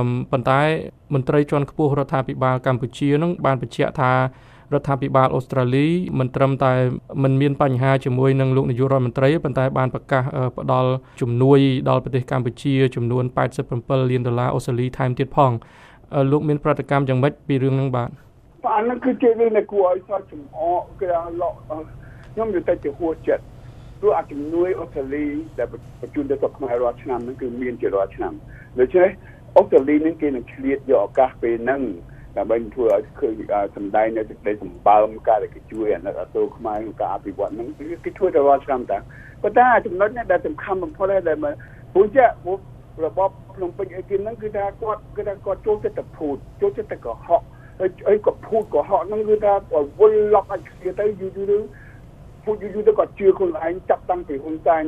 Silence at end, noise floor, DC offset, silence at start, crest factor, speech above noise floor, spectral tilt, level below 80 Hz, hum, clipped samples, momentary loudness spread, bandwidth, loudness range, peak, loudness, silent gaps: 0 s; -42 dBFS; under 0.1%; 0 s; 20 dB; 22 dB; -8.5 dB/octave; -46 dBFS; none; under 0.1%; 11 LU; 10 kHz; 6 LU; 0 dBFS; -21 LUFS; none